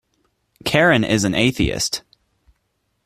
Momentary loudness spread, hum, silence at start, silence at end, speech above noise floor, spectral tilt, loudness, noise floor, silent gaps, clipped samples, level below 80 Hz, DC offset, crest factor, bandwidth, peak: 10 LU; none; 0.65 s; 1.05 s; 53 dB; -4 dB/octave; -18 LUFS; -70 dBFS; none; under 0.1%; -40 dBFS; under 0.1%; 20 dB; 15.5 kHz; 0 dBFS